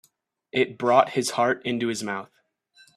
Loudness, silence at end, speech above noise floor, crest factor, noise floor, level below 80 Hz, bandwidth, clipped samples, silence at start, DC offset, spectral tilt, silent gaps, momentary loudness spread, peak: -24 LUFS; 0.7 s; 43 dB; 22 dB; -67 dBFS; -70 dBFS; 15 kHz; under 0.1%; 0.55 s; under 0.1%; -4 dB/octave; none; 10 LU; -4 dBFS